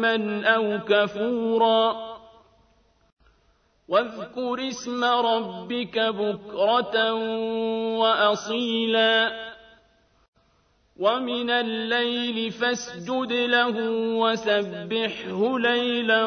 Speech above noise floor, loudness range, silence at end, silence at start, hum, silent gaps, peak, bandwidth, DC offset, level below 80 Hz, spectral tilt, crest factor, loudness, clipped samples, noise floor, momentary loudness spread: 41 dB; 4 LU; 0 s; 0 s; none; 3.12-3.17 s, 10.28-10.33 s; -6 dBFS; 6.6 kHz; under 0.1%; -66 dBFS; -4 dB/octave; 18 dB; -24 LUFS; under 0.1%; -64 dBFS; 9 LU